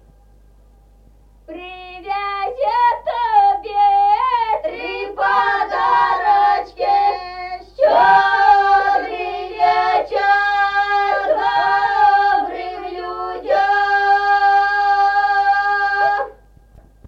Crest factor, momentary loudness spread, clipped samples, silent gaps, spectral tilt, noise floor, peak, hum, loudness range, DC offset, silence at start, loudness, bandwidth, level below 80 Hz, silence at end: 14 dB; 13 LU; under 0.1%; none; -3.5 dB/octave; -48 dBFS; -2 dBFS; none; 3 LU; under 0.1%; 1.5 s; -16 LUFS; 7 kHz; -48 dBFS; 0.75 s